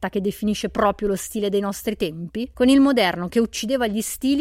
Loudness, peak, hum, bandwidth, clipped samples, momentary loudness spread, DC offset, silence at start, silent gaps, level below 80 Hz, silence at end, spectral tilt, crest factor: -21 LUFS; -4 dBFS; none; 16.5 kHz; under 0.1%; 10 LU; under 0.1%; 0 s; none; -46 dBFS; 0 s; -4.5 dB/octave; 16 dB